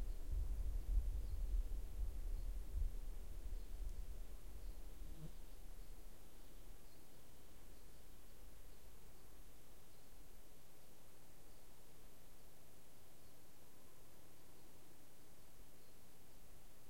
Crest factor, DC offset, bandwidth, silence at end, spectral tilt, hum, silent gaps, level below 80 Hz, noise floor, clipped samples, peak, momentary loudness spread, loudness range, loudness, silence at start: 22 dB; 0.4%; 16.5 kHz; 0 s; -5.5 dB/octave; none; none; -50 dBFS; -66 dBFS; under 0.1%; -28 dBFS; 18 LU; 16 LU; -53 LUFS; 0 s